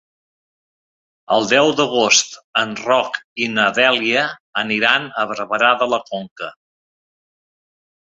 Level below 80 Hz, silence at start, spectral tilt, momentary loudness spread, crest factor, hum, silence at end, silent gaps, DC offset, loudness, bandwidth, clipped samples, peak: -64 dBFS; 1.3 s; -2 dB/octave; 11 LU; 20 dB; none; 1.55 s; 2.44-2.53 s, 3.24-3.36 s, 4.40-4.53 s, 6.31-6.36 s; under 0.1%; -17 LUFS; 8 kHz; under 0.1%; 0 dBFS